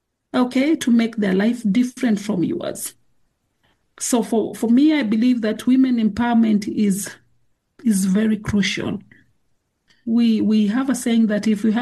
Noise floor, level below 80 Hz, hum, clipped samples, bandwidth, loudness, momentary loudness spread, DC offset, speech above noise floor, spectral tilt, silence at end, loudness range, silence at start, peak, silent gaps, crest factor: -68 dBFS; -54 dBFS; none; under 0.1%; 12.5 kHz; -19 LUFS; 9 LU; under 0.1%; 50 dB; -5.5 dB/octave; 0 s; 4 LU; 0.35 s; -8 dBFS; none; 12 dB